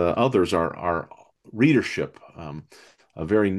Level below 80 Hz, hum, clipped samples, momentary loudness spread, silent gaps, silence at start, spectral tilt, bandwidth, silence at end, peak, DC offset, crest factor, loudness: -56 dBFS; none; under 0.1%; 21 LU; none; 0 s; -7 dB/octave; 12.5 kHz; 0 s; -6 dBFS; under 0.1%; 18 dB; -23 LUFS